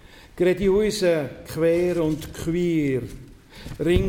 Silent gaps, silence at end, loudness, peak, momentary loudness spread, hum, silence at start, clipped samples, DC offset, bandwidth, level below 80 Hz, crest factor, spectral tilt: none; 0 s; -23 LUFS; -6 dBFS; 11 LU; none; 0.15 s; under 0.1%; under 0.1%; 16.5 kHz; -38 dBFS; 16 dB; -6.5 dB/octave